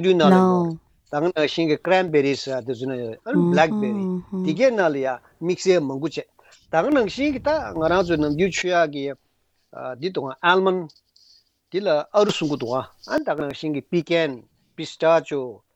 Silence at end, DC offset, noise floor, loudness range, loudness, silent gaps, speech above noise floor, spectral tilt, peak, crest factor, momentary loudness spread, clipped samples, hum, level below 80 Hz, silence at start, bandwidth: 0.2 s; under 0.1%; -57 dBFS; 3 LU; -22 LUFS; none; 36 dB; -6 dB/octave; -2 dBFS; 20 dB; 11 LU; under 0.1%; none; -54 dBFS; 0 s; 8.4 kHz